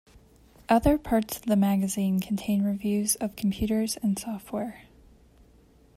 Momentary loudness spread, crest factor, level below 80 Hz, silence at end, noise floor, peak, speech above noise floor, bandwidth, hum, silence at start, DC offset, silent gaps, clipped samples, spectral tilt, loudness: 10 LU; 20 dB; -46 dBFS; 1.15 s; -57 dBFS; -8 dBFS; 32 dB; 16 kHz; none; 0.7 s; under 0.1%; none; under 0.1%; -5.5 dB/octave; -27 LUFS